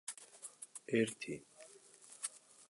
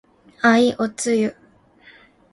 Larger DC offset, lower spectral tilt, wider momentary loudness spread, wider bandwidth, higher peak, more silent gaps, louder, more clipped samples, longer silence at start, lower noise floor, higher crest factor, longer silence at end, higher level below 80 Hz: neither; about the same, -4 dB/octave vs -4 dB/octave; first, 22 LU vs 8 LU; about the same, 12 kHz vs 11.5 kHz; second, -20 dBFS vs -2 dBFS; neither; second, -42 LUFS vs -19 LUFS; neither; second, 0.1 s vs 0.45 s; first, -61 dBFS vs -51 dBFS; about the same, 24 dB vs 20 dB; second, 0.05 s vs 1 s; second, -84 dBFS vs -60 dBFS